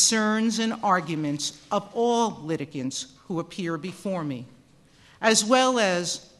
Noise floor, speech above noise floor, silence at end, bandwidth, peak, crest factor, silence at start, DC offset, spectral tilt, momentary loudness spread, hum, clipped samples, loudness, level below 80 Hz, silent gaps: -56 dBFS; 31 dB; 0.15 s; 12.5 kHz; -6 dBFS; 20 dB; 0 s; under 0.1%; -3 dB/octave; 12 LU; none; under 0.1%; -25 LUFS; -66 dBFS; none